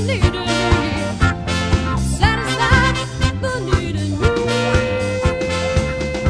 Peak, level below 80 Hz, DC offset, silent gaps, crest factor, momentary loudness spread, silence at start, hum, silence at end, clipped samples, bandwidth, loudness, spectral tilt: 0 dBFS; -26 dBFS; under 0.1%; none; 16 dB; 5 LU; 0 s; none; 0 s; under 0.1%; 11 kHz; -18 LUFS; -5.5 dB/octave